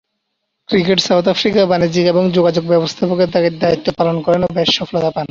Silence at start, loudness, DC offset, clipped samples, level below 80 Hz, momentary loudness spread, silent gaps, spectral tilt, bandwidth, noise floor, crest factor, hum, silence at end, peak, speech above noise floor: 0.7 s; -14 LUFS; under 0.1%; under 0.1%; -48 dBFS; 4 LU; none; -5.5 dB/octave; 7.6 kHz; -72 dBFS; 14 dB; none; 0.05 s; 0 dBFS; 58 dB